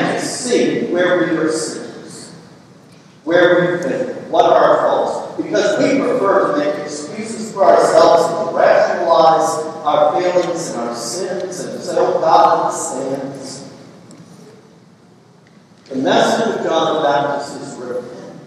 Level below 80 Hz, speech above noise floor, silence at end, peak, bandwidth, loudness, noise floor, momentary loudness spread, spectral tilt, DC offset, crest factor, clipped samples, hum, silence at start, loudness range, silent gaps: -66 dBFS; 32 dB; 0 s; 0 dBFS; 13 kHz; -15 LUFS; -46 dBFS; 15 LU; -4 dB/octave; under 0.1%; 16 dB; under 0.1%; none; 0 s; 7 LU; none